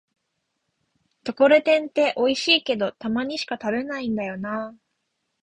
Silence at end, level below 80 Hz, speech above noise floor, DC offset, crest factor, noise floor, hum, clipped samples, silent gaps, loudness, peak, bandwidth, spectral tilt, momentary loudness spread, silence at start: 0.7 s; -64 dBFS; 54 dB; under 0.1%; 20 dB; -77 dBFS; none; under 0.1%; none; -22 LUFS; -4 dBFS; 10 kHz; -4 dB/octave; 13 LU; 1.25 s